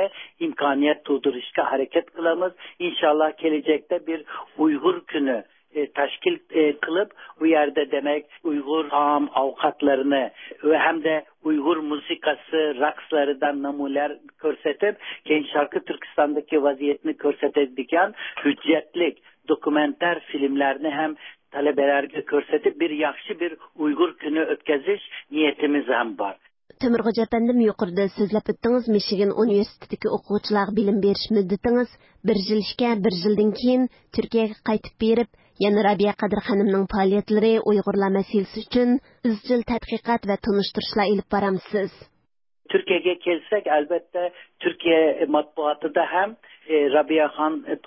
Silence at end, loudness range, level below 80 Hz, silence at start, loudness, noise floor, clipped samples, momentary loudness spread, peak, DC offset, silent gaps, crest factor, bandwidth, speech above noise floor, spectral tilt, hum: 0.1 s; 3 LU; -56 dBFS; 0 s; -23 LUFS; -73 dBFS; under 0.1%; 8 LU; -6 dBFS; under 0.1%; none; 16 dB; 5.8 kHz; 50 dB; -10 dB/octave; none